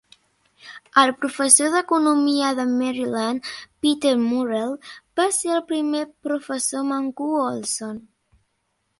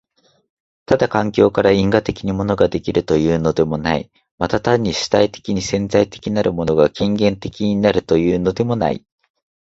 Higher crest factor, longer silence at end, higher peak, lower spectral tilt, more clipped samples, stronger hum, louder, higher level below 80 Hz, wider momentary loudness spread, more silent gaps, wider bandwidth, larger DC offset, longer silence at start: about the same, 22 dB vs 18 dB; first, 1 s vs 0.65 s; about the same, 0 dBFS vs 0 dBFS; second, -2 dB/octave vs -6 dB/octave; neither; neither; second, -21 LUFS vs -17 LUFS; second, -66 dBFS vs -42 dBFS; first, 13 LU vs 6 LU; second, none vs 4.31-4.38 s; first, 12 kHz vs 8 kHz; neither; second, 0.65 s vs 0.9 s